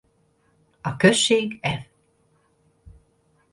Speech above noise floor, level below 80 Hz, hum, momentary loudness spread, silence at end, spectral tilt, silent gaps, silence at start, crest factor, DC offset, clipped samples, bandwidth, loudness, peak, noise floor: 44 dB; -56 dBFS; none; 16 LU; 1.7 s; -4 dB/octave; none; 0.85 s; 24 dB; under 0.1%; under 0.1%; 11.5 kHz; -21 LUFS; 0 dBFS; -64 dBFS